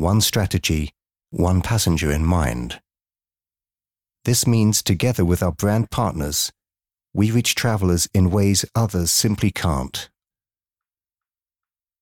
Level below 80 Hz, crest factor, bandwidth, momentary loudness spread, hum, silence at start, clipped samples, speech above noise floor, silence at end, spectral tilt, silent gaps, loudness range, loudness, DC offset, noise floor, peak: -38 dBFS; 14 dB; 18.5 kHz; 11 LU; none; 0 s; under 0.1%; over 71 dB; 1.95 s; -4.5 dB/octave; none; 4 LU; -20 LUFS; under 0.1%; under -90 dBFS; -6 dBFS